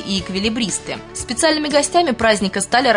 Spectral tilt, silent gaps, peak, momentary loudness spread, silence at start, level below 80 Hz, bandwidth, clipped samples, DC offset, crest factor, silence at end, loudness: -3 dB/octave; none; -2 dBFS; 9 LU; 0 s; -44 dBFS; 11 kHz; under 0.1%; under 0.1%; 16 dB; 0 s; -18 LUFS